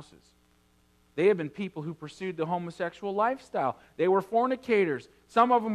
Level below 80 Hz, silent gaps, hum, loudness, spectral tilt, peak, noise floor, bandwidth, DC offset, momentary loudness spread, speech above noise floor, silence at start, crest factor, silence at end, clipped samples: -70 dBFS; none; none; -28 LUFS; -7 dB/octave; -8 dBFS; -65 dBFS; 12 kHz; under 0.1%; 12 LU; 37 dB; 0 s; 20 dB; 0 s; under 0.1%